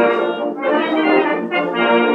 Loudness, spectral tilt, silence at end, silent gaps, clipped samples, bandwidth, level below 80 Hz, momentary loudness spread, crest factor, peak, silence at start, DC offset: -17 LUFS; -6.5 dB/octave; 0 s; none; under 0.1%; 5.6 kHz; -80 dBFS; 5 LU; 12 dB; -4 dBFS; 0 s; under 0.1%